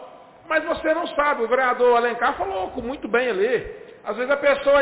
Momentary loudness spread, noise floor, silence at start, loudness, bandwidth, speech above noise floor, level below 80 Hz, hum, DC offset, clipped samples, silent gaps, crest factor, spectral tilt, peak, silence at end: 11 LU; -44 dBFS; 0 s; -22 LUFS; 4 kHz; 23 dB; -52 dBFS; none; under 0.1%; under 0.1%; none; 12 dB; -8 dB/octave; -10 dBFS; 0 s